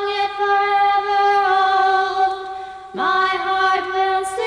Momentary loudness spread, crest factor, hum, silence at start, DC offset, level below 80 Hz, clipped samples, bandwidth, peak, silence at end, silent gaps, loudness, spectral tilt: 7 LU; 10 dB; none; 0 s; under 0.1%; -56 dBFS; under 0.1%; 10.5 kHz; -6 dBFS; 0 s; none; -17 LUFS; -2 dB/octave